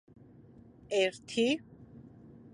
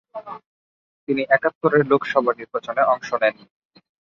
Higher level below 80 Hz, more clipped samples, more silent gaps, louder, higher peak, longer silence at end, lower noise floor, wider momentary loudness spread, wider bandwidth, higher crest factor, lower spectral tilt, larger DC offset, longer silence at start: about the same, -68 dBFS vs -68 dBFS; neither; second, none vs 0.46-1.07 s, 1.55-1.61 s; second, -32 LUFS vs -20 LUFS; second, -16 dBFS vs -2 dBFS; second, 0.05 s vs 0.85 s; second, -56 dBFS vs under -90 dBFS; first, 24 LU vs 18 LU; first, 11.5 kHz vs 7 kHz; about the same, 20 dB vs 20 dB; second, -4 dB/octave vs -6.5 dB/octave; neither; first, 0.9 s vs 0.15 s